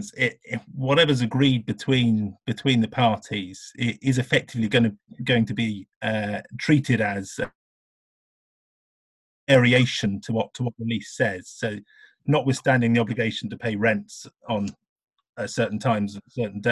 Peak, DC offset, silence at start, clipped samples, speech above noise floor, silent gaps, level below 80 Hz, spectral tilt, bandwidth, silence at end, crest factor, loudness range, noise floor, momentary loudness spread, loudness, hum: -4 dBFS; under 0.1%; 0 s; under 0.1%; over 67 dB; 5.96-6.01 s, 7.55-9.47 s, 14.89-14.96 s, 15.04-15.08 s, 15.29-15.33 s; -56 dBFS; -6 dB/octave; 12 kHz; 0 s; 20 dB; 5 LU; under -90 dBFS; 11 LU; -24 LUFS; none